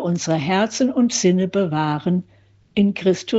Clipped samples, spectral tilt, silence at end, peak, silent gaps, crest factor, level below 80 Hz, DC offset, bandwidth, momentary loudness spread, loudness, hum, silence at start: under 0.1%; -5.5 dB/octave; 0 s; -4 dBFS; none; 14 dB; -60 dBFS; under 0.1%; 8 kHz; 5 LU; -20 LUFS; none; 0 s